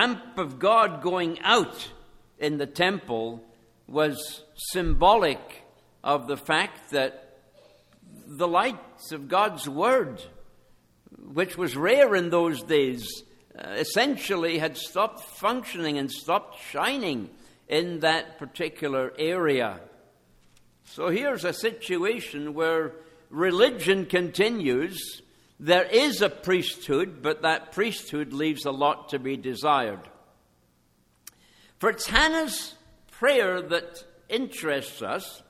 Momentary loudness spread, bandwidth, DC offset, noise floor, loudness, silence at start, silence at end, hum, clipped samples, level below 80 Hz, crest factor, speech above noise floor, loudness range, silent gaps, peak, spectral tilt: 14 LU; 16 kHz; under 0.1%; -65 dBFS; -26 LUFS; 0 s; 0.1 s; none; under 0.1%; -46 dBFS; 24 dB; 40 dB; 4 LU; none; -2 dBFS; -4 dB/octave